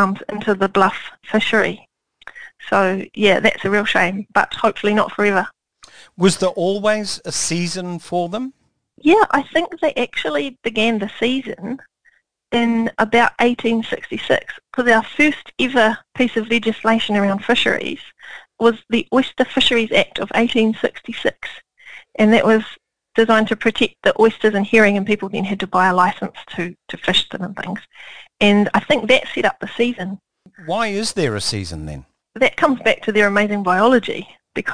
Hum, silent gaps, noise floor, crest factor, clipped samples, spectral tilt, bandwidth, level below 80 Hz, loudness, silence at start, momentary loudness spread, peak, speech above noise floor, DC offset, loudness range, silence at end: none; none; -59 dBFS; 18 dB; under 0.1%; -4.5 dB/octave; 10.5 kHz; -50 dBFS; -17 LUFS; 0 s; 14 LU; 0 dBFS; 41 dB; 0.8%; 4 LU; 0 s